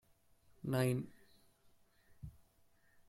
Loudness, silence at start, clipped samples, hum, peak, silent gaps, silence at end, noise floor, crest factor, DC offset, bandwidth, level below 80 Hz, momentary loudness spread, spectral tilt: -38 LUFS; 0.65 s; under 0.1%; none; -22 dBFS; none; 0.75 s; -71 dBFS; 22 dB; under 0.1%; 15 kHz; -68 dBFS; 21 LU; -6.5 dB/octave